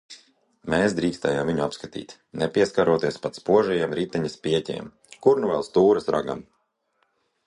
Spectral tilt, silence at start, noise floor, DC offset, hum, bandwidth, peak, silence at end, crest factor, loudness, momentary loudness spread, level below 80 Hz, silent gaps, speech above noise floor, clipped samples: -6 dB/octave; 0.1 s; -71 dBFS; under 0.1%; none; 11 kHz; -4 dBFS; 1.05 s; 20 dB; -23 LUFS; 15 LU; -56 dBFS; none; 48 dB; under 0.1%